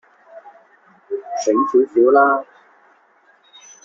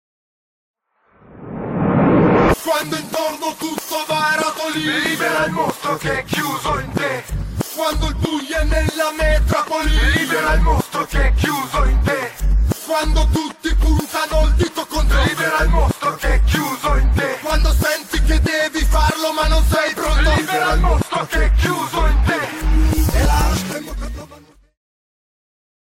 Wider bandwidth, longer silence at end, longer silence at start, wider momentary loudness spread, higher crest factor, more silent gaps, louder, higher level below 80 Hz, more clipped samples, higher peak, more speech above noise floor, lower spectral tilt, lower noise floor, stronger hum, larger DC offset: second, 7.4 kHz vs 16.5 kHz; about the same, 1.4 s vs 1.45 s; second, 0.35 s vs 1.3 s; first, 15 LU vs 6 LU; first, 18 dB vs 12 dB; neither; about the same, -17 LUFS vs -18 LUFS; second, -68 dBFS vs -20 dBFS; neither; about the same, -2 dBFS vs -4 dBFS; about the same, 41 dB vs 38 dB; second, -3 dB/octave vs -5 dB/octave; about the same, -55 dBFS vs -55 dBFS; neither; neither